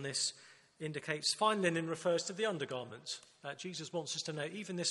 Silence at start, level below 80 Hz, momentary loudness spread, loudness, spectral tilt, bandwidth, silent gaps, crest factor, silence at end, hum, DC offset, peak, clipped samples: 0 s; -82 dBFS; 13 LU; -37 LUFS; -3 dB/octave; 11.5 kHz; none; 20 dB; 0 s; none; under 0.1%; -18 dBFS; under 0.1%